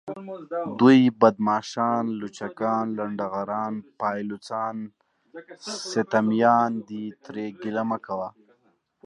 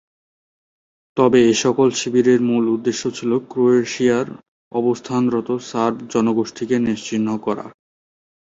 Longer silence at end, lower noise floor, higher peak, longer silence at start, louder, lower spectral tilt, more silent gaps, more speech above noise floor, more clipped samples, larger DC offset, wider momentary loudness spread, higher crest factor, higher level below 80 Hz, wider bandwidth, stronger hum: about the same, 0.75 s vs 0.8 s; second, -67 dBFS vs under -90 dBFS; about the same, -4 dBFS vs -2 dBFS; second, 0.05 s vs 1.15 s; second, -24 LUFS vs -19 LUFS; about the same, -6 dB/octave vs -5 dB/octave; second, none vs 4.48-4.71 s; second, 43 dB vs over 72 dB; neither; neither; first, 16 LU vs 9 LU; first, 22 dB vs 16 dB; second, -72 dBFS vs -60 dBFS; first, 10.5 kHz vs 8 kHz; neither